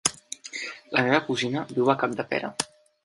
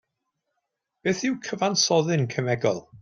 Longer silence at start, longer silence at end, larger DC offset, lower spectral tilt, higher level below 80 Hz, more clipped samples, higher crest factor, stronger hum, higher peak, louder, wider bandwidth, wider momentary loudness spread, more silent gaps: second, 0.05 s vs 1.05 s; first, 0.4 s vs 0.05 s; neither; about the same, -3.5 dB/octave vs -4 dB/octave; about the same, -66 dBFS vs -66 dBFS; neither; about the same, 22 dB vs 18 dB; neither; first, -4 dBFS vs -8 dBFS; about the same, -26 LUFS vs -24 LUFS; about the same, 11.5 kHz vs 12 kHz; first, 12 LU vs 7 LU; neither